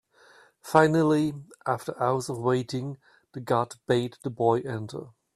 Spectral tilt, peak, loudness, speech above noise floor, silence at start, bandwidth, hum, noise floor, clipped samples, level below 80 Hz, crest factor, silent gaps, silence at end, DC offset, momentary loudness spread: -6.5 dB/octave; -4 dBFS; -26 LUFS; 31 dB; 0.65 s; 14.5 kHz; none; -57 dBFS; under 0.1%; -66 dBFS; 24 dB; none; 0.25 s; under 0.1%; 18 LU